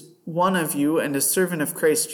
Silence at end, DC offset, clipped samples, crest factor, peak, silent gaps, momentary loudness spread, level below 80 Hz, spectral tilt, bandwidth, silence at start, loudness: 0 s; under 0.1%; under 0.1%; 14 dB; -8 dBFS; none; 3 LU; -72 dBFS; -4 dB/octave; 19 kHz; 0 s; -22 LUFS